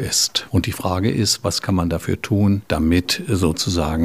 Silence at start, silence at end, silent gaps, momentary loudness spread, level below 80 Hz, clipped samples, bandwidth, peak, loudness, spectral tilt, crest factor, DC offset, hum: 0 s; 0 s; none; 4 LU; -36 dBFS; under 0.1%; 16 kHz; -4 dBFS; -19 LUFS; -4.5 dB/octave; 14 dB; 0.3%; none